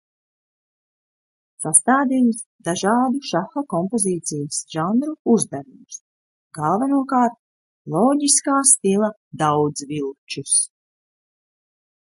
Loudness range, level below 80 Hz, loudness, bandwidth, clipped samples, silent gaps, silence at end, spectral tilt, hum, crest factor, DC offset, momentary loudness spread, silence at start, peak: 5 LU; -68 dBFS; -19 LUFS; 12 kHz; under 0.1%; 2.46-2.59 s, 5.19-5.25 s, 6.00-6.51 s, 7.39-7.85 s, 9.17-9.31 s, 10.18-10.27 s; 1.4 s; -3.5 dB/octave; none; 22 dB; under 0.1%; 14 LU; 1.6 s; 0 dBFS